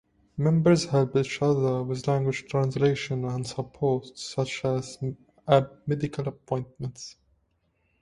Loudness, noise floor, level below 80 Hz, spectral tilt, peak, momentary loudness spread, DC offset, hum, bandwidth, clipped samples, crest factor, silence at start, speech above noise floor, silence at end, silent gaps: -27 LUFS; -71 dBFS; -58 dBFS; -6.5 dB/octave; -6 dBFS; 13 LU; under 0.1%; none; 11 kHz; under 0.1%; 22 dB; 0.35 s; 45 dB; 0.9 s; none